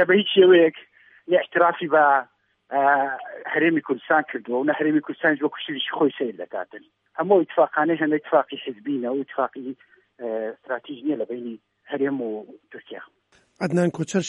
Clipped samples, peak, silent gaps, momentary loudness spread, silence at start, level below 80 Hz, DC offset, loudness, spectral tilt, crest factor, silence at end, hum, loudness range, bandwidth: under 0.1%; -4 dBFS; none; 18 LU; 0 s; -76 dBFS; under 0.1%; -22 LUFS; -5.5 dB/octave; 18 dB; 0 s; none; 9 LU; 10.5 kHz